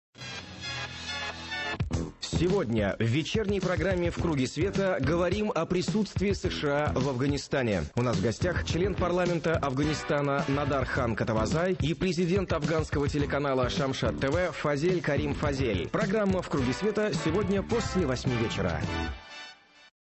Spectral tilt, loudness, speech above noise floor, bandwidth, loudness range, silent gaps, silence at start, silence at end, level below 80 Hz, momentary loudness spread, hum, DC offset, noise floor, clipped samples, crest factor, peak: -6 dB/octave; -29 LUFS; 22 dB; 8.6 kHz; 1 LU; none; 0.2 s; 0.5 s; -42 dBFS; 7 LU; none; under 0.1%; -50 dBFS; under 0.1%; 14 dB; -14 dBFS